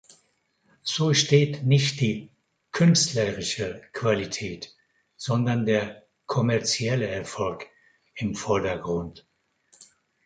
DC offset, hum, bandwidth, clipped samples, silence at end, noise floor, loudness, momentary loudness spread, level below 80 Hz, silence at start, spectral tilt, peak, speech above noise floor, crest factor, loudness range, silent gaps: under 0.1%; none; 9.4 kHz; under 0.1%; 1.05 s; -69 dBFS; -25 LUFS; 16 LU; -56 dBFS; 0.85 s; -4.5 dB/octave; -6 dBFS; 45 dB; 20 dB; 5 LU; none